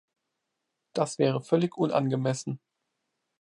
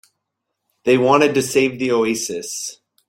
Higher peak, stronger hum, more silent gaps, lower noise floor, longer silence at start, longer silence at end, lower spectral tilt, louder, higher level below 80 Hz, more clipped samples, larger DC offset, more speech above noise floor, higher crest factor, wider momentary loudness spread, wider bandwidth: second, -10 dBFS vs -2 dBFS; neither; neither; first, -82 dBFS vs -77 dBFS; about the same, 0.95 s vs 0.85 s; first, 0.85 s vs 0.35 s; first, -6.5 dB/octave vs -4 dB/octave; second, -28 LUFS vs -18 LUFS; second, -76 dBFS vs -60 dBFS; neither; neither; second, 56 dB vs 60 dB; about the same, 20 dB vs 18 dB; about the same, 11 LU vs 12 LU; second, 11.5 kHz vs 16.5 kHz